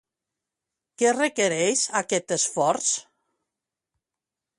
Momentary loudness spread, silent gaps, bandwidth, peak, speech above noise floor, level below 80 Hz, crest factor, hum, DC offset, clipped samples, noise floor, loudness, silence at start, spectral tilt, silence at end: 4 LU; none; 11.5 kHz; -8 dBFS; 65 dB; -72 dBFS; 18 dB; none; under 0.1%; under 0.1%; -88 dBFS; -23 LUFS; 1 s; -2 dB/octave; 1.55 s